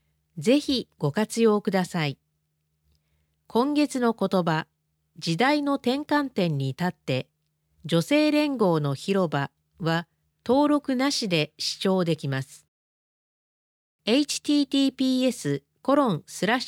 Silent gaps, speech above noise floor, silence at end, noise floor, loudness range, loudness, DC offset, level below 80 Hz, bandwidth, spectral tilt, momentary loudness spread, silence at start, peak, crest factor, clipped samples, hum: 12.68-13.99 s; 51 dB; 0 s; -75 dBFS; 3 LU; -25 LUFS; under 0.1%; -66 dBFS; 16.5 kHz; -5.5 dB/octave; 9 LU; 0.35 s; -8 dBFS; 16 dB; under 0.1%; none